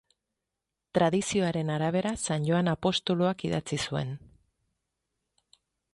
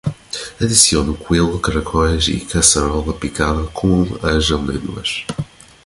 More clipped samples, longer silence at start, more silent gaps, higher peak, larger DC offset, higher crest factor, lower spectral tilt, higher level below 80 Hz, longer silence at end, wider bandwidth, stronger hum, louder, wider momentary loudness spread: neither; first, 0.95 s vs 0.05 s; neither; second, -12 dBFS vs 0 dBFS; neither; about the same, 18 dB vs 18 dB; first, -5 dB/octave vs -3.5 dB/octave; second, -60 dBFS vs -28 dBFS; first, 1.75 s vs 0.4 s; second, 11.5 kHz vs 16 kHz; neither; second, -28 LUFS vs -16 LUFS; second, 6 LU vs 13 LU